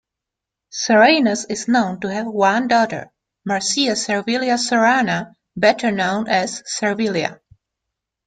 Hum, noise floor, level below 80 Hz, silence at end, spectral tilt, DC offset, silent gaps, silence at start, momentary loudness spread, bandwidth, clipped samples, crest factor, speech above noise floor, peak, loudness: none; -84 dBFS; -62 dBFS; 0.9 s; -3.5 dB/octave; under 0.1%; none; 0.75 s; 11 LU; 9.4 kHz; under 0.1%; 18 dB; 66 dB; -2 dBFS; -18 LUFS